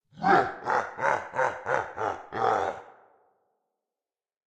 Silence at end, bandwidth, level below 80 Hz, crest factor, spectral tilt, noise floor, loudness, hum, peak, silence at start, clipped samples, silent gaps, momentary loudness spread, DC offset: 1.65 s; 9.2 kHz; -68 dBFS; 22 dB; -5 dB/octave; under -90 dBFS; -27 LUFS; none; -8 dBFS; 0.15 s; under 0.1%; none; 9 LU; under 0.1%